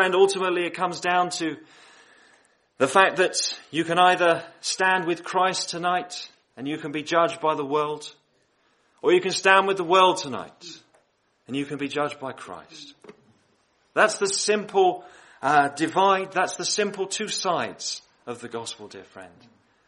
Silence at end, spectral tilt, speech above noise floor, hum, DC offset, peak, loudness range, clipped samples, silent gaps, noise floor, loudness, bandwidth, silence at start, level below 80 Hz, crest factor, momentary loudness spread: 0.6 s; -3 dB/octave; 43 dB; none; under 0.1%; -2 dBFS; 6 LU; under 0.1%; none; -67 dBFS; -23 LUFS; 11.5 kHz; 0 s; -74 dBFS; 24 dB; 19 LU